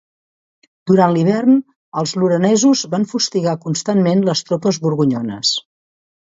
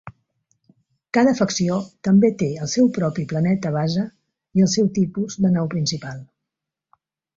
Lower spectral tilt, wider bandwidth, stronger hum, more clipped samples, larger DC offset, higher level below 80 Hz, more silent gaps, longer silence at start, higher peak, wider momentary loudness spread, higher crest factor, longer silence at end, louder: about the same, -5 dB/octave vs -6 dB/octave; about the same, 8 kHz vs 7.6 kHz; neither; neither; neither; about the same, -62 dBFS vs -58 dBFS; first, 1.76-1.92 s vs none; first, 0.85 s vs 0.05 s; first, 0 dBFS vs -4 dBFS; about the same, 8 LU vs 8 LU; about the same, 16 dB vs 16 dB; second, 0.7 s vs 1.1 s; first, -16 LUFS vs -20 LUFS